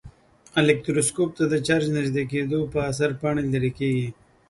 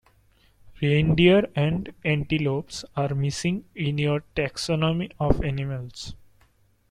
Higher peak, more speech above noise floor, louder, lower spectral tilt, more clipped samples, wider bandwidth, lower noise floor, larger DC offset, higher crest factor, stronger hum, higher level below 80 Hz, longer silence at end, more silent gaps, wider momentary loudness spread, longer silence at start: about the same, -4 dBFS vs -4 dBFS; second, 25 dB vs 38 dB; about the same, -24 LUFS vs -24 LUFS; about the same, -5.5 dB/octave vs -6.5 dB/octave; neither; about the same, 12 kHz vs 11 kHz; second, -48 dBFS vs -61 dBFS; neither; about the same, 20 dB vs 22 dB; neither; second, -52 dBFS vs -42 dBFS; second, 0.4 s vs 0.75 s; neither; second, 5 LU vs 13 LU; second, 0.05 s vs 0.65 s